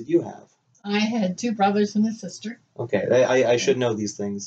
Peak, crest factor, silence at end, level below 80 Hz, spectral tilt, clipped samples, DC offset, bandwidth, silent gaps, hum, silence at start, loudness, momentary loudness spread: -8 dBFS; 16 dB; 0 s; -70 dBFS; -5 dB/octave; under 0.1%; under 0.1%; 8.2 kHz; none; none; 0 s; -22 LUFS; 16 LU